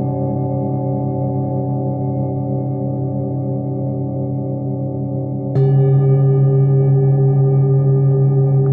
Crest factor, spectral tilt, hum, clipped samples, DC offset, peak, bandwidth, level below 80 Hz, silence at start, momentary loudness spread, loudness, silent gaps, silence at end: 10 dB; -14.5 dB/octave; none; under 0.1%; under 0.1%; -6 dBFS; 1.8 kHz; -52 dBFS; 0 s; 8 LU; -17 LUFS; none; 0 s